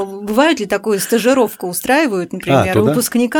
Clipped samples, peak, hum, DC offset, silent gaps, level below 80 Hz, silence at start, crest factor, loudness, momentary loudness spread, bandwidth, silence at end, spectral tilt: under 0.1%; 0 dBFS; none; under 0.1%; none; -52 dBFS; 0 s; 14 dB; -15 LUFS; 5 LU; over 20 kHz; 0 s; -4.5 dB/octave